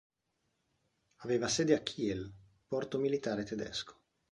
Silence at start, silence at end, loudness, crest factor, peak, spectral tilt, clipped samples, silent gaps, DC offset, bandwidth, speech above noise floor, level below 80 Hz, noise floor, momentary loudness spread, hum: 1.2 s; 0.4 s; -35 LUFS; 22 dB; -16 dBFS; -4.5 dB/octave; under 0.1%; none; under 0.1%; 11.5 kHz; 48 dB; -66 dBFS; -82 dBFS; 13 LU; none